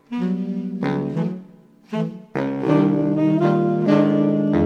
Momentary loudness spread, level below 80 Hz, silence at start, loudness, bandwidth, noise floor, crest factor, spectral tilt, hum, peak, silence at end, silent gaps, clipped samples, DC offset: 10 LU; -54 dBFS; 0.1 s; -20 LUFS; 6.8 kHz; -47 dBFS; 16 dB; -9.5 dB/octave; none; -4 dBFS; 0 s; none; under 0.1%; under 0.1%